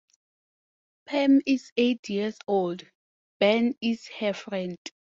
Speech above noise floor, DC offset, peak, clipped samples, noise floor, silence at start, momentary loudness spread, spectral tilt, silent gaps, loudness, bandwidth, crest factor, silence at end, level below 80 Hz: over 64 dB; under 0.1%; -10 dBFS; under 0.1%; under -90 dBFS; 1.1 s; 11 LU; -5.5 dB/octave; 1.72-1.76 s, 1.99-2.03 s, 2.95-3.40 s, 4.78-4.85 s; -26 LUFS; 7.6 kHz; 18 dB; 0.15 s; -72 dBFS